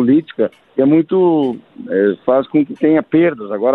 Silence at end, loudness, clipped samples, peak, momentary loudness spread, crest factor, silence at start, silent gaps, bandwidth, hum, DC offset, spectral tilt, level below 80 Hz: 0 s; -15 LUFS; under 0.1%; -2 dBFS; 8 LU; 12 dB; 0 s; none; 4.1 kHz; none; under 0.1%; -10 dB/octave; -60 dBFS